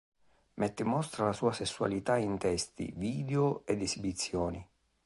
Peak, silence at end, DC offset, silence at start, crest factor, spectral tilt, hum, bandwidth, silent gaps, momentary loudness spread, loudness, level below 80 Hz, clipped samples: -14 dBFS; 0.4 s; under 0.1%; 0.55 s; 18 dB; -5 dB/octave; none; 11.5 kHz; none; 6 LU; -33 LUFS; -56 dBFS; under 0.1%